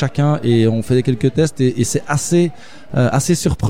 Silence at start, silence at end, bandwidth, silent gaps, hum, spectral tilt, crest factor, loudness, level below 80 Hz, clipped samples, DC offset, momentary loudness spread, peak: 0 s; 0 s; 16.5 kHz; none; none; -6 dB/octave; 14 dB; -16 LUFS; -38 dBFS; under 0.1%; 2%; 4 LU; -2 dBFS